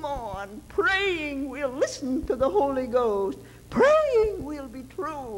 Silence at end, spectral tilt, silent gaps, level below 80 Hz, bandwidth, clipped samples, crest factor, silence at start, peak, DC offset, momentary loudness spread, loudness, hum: 0 s; -4.5 dB/octave; none; -46 dBFS; 16 kHz; under 0.1%; 16 dB; 0 s; -10 dBFS; under 0.1%; 15 LU; -25 LUFS; none